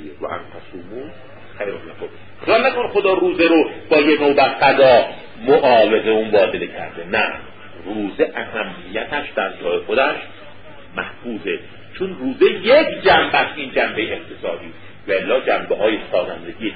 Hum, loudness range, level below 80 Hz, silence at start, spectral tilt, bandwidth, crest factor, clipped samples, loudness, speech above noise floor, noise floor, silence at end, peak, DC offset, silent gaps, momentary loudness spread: none; 9 LU; -50 dBFS; 0 s; -9.5 dB/octave; 5 kHz; 16 dB; under 0.1%; -17 LUFS; 24 dB; -41 dBFS; 0 s; -2 dBFS; 1%; none; 19 LU